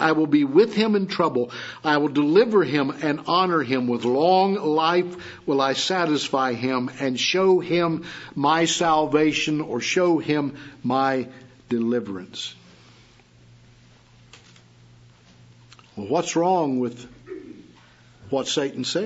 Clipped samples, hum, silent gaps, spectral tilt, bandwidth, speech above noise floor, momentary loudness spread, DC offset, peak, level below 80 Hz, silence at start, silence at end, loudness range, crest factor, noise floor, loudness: under 0.1%; none; none; -4.5 dB/octave; 8 kHz; 31 dB; 13 LU; under 0.1%; -4 dBFS; -62 dBFS; 0 s; 0 s; 11 LU; 18 dB; -53 dBFS; -22 LUFS